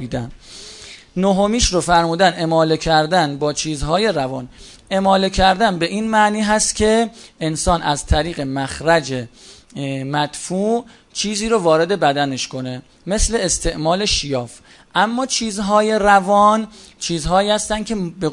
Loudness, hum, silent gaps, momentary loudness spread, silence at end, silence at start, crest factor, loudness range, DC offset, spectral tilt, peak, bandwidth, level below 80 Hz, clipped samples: -17 LUFS; none; none; 13 LU; 0 s; 0 s; 18 dB; 4 LU; under 0.1%; -4 dB/octave; 0 dBFS; 11 kHz; -34 dBFS; under 0.1%